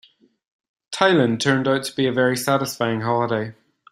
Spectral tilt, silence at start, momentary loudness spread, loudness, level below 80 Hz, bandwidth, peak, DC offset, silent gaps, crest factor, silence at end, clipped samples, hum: -5 dB/octave; 0.9 s; 7 LU; -20 LUFS; -62 dBFS; 16 kHz; -2 dBFS; under 0.1%; none; 20 dB; 0.4 s; under 0.1%; none